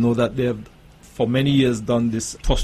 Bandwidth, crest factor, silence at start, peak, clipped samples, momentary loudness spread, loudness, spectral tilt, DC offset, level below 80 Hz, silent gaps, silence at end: 13.5 kHz; 16 dB; 0 s; -4 dBFS; under 0.1%; 8 LU; -21 LUFS; -6 dB/octave; under 0.1%; -32 dBFS; none; 0 s